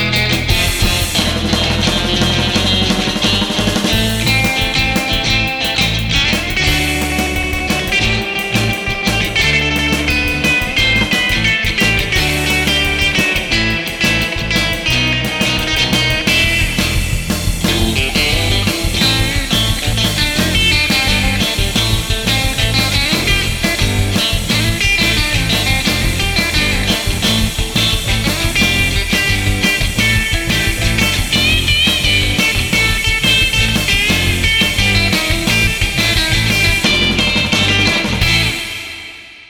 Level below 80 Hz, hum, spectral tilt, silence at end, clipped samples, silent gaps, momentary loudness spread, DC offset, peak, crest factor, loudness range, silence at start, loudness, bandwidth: -24 dBFS; none; -3 dB/octave; 0.05 s; under 0.1%; none; 4 LU; under 0.1%; -2 dBFS; 12 dB; 2 LU; 0 s; -13 LUFS; over 20 kHz